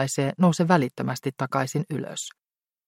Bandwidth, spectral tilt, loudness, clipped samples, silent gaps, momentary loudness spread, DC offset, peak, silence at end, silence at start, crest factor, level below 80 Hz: 16 kHz; -5.5 dB/octave; -25 LUFS; under 0.1%; none; 11 LU; under 0.1%; -4 dBFS; 0.6 s; 0 s; 22 dB; -68 dBFS